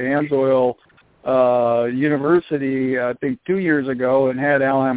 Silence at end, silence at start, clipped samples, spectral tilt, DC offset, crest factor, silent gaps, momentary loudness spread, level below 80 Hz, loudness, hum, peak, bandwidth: 0 s; 0 s; under 0.1%; -11 dB/octave; under 0.1%; 14 dB; none; 6 LU; -60 dBFS; -19 LUFS; none; -4 dBFS; 4 kHz